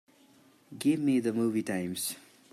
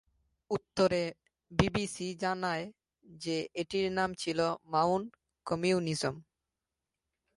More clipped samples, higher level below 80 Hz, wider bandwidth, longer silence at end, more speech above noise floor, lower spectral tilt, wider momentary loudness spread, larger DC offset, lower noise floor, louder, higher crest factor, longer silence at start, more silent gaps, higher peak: neither; second, -76 dBFS vs -56 dBFS; first, 15 kHz vs 11.5 kHz; second, 0.35 s vs 1.15 s; second, 32 dB vs 57 dB; about the same, -5 dB/octave vs -5 dB/octave; about the same, 8 LU vs 9 LU; neither; second, -61 dBFS vs -89 dBFS; first, -30 LUFS vs -33 LUFS; second, 16 dB vs 26 dB; first, 0.7 s vs 0.5 s; neither; second, -16 dBFS vs -8 dBFS